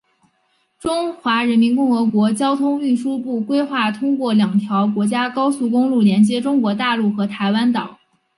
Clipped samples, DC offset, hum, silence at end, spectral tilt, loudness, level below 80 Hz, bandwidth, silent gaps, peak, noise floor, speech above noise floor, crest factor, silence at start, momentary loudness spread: under 0.1%; under 0.1%; none; 0.45 s; -6 dB/octave; -18 LUFS; -62 dBFS; 11.5 kHz; none; -4 dBFS; -64 dBFS; 47 dB; 14 dB; 0.85 s; 6 LU